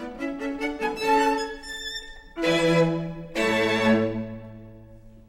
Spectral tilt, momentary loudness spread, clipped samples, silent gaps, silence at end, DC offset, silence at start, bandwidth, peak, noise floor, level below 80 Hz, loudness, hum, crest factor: -5 dB/octave; 16 LU; under 0.1%; none; 0.1 s; under 0.1%; 0 s; 16 kHz; -8 dBFS; -47 dBFS; -48 dBFS; -25 LUFS; none; 18 dB